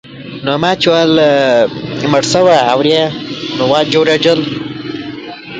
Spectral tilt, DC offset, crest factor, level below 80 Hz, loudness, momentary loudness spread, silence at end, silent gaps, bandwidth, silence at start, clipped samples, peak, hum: -4.5 dB/octave; under 0.1%; 12 dB; -50 dBFS; -11 LUFS; 14 LU; 0 s; none; 9.4 kHz; 0.05 s; under 0.1%; 0 dBFS; none